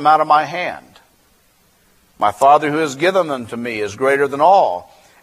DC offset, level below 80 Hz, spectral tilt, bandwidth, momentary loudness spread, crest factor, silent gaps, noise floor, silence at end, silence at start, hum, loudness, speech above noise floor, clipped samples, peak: under 0.1%; -60 dBFS; -4.5 dB/octave; 14.5 kHz; 12 LU; 16 dB; none; -56 dBFS; 0.4 s; 0 s; none; -16 LUFS; 41 dB; under 0.1%; 0 dBFS